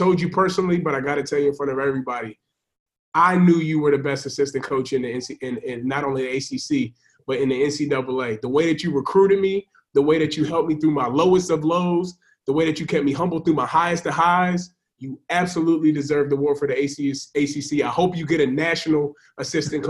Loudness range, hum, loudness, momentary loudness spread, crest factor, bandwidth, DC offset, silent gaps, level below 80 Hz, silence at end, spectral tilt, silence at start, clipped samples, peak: 4 LU; none; -21 LUFS; 10 LU; 16 dB; 12 kHz; under 0.1%; 2.80-2.86 s, 2.99-3.12 s; -58 dBFS; 0 s; -6 dB/octave; 0 s; under 0.1%; -4 dBFS